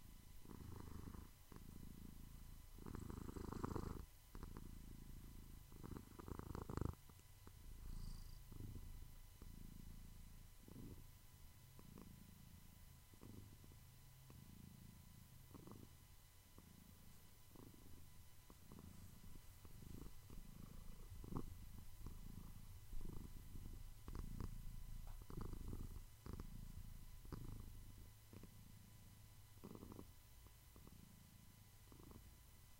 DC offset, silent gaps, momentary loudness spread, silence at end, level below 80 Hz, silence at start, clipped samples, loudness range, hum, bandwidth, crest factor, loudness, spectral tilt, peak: under 0.1%; none; 12 LU; 0 s; -58 dBFS; 0 s; under 0.1%; 8 LU; none; 16 kHz; 26 dB; -59 LUFS; -6 dB/octave; -28 dBFS